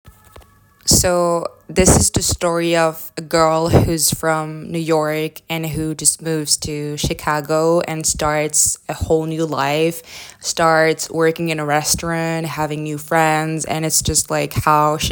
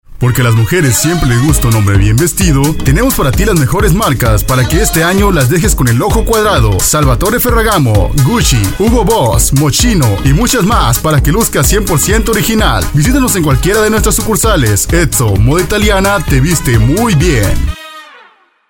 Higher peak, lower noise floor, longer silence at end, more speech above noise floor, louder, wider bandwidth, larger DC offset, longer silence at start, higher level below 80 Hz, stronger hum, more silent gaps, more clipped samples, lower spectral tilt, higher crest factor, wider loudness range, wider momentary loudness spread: about the same, 0 dBFS vs 0 dBFS; about the same, -47 dBFS vs -44 dBFS; second, 0 s vs 0.65 s; second, 29 dB vs 35 dB; second, -17 LUFS vs -9 LUFS; about the same, 19 kHz vs 17.5 kHz; neither; about the same, 0.05 s vs 0.1 s; second, -34 dBFS vs -16 dBFS; neither; neither; neither; about the same, -3.5 dB/octave vs -4.5 dB/octave; first, 18 dB vs 8 dB; first, 3 LU vs 0 LU; first, 9 LU vs 2 LU